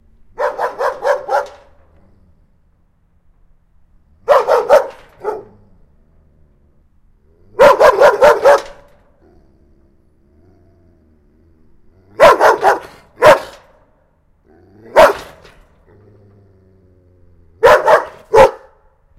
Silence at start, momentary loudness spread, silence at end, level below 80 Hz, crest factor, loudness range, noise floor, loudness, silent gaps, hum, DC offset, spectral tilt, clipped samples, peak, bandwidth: 0.4 s; 19 LU; 0.65 s; -46 dBFS; 16 dB; 9 LU; -55 dBFS; -11 LUFS; none; none; under 0.1%; -3.5 dB/octave; 0.4%; 0 dBFS; 16 kHz